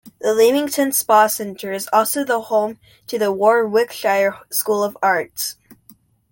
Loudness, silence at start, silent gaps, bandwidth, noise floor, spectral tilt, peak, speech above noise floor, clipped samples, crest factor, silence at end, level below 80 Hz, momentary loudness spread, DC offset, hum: -18 LUFS; 0.05 s; none; 17 kHz; -51 dBFS; -2.5 dB/octave; -2 dBFS; 34 dB; under 0.1%; 16 dB; 0.6 s; -66 dBFS; 11 LU; under 0.1%; none